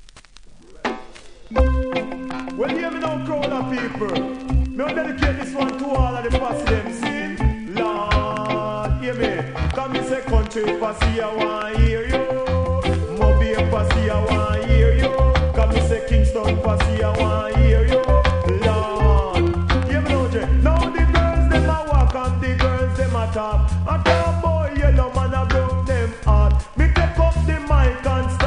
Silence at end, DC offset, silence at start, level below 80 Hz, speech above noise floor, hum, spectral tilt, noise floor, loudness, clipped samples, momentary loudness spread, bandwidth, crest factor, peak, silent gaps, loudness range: 0 s; under 0.1%; 0.05 s; -22 dBFS; 23 dB; none; -7 dB/octave; -43 dBFS; -20 LUFS; under 0.1%; 6 LU; 10.5 kHz; 16 dB; -2 dBFS; none; 5 LU